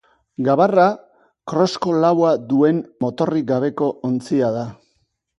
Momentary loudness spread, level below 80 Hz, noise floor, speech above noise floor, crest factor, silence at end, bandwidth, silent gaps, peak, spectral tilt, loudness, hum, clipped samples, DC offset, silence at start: 11 LU; -62 dBFS; -67 dBFS; 50 dB; 18 dB; 0.65 s; 11 kHz; none; -2 dBFS; -7 dB/octave; -18 LUFS; none; under 0.1%; under 0.1%; 0.4 s